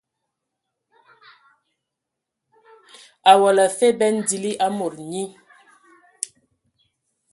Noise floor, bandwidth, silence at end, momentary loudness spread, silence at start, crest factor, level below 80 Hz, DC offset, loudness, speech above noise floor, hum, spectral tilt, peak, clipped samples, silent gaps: -83 dBFS; 12 kHz; 2.05 s; 18 LU; 3.25 s; 24 dB; -72 dBFS; under 0.1%; -19 LUFS; 65 dB; none; -3 dB/octave; 0 dBFS; under 0.1%; none